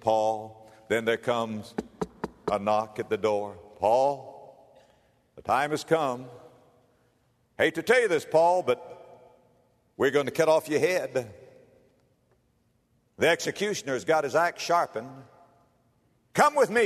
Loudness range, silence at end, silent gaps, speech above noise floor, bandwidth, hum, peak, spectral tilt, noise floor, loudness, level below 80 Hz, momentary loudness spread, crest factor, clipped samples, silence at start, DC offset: 4 LU; 0 s; none; 44 dB; 13.5 kHz; none; -6 dBFS; -4 dB/octave; -69 dBFS; -26 LUFS; -66 dBFS; 15 LU; 22 dB; under 0.1%; 0.05 s; under 0.1%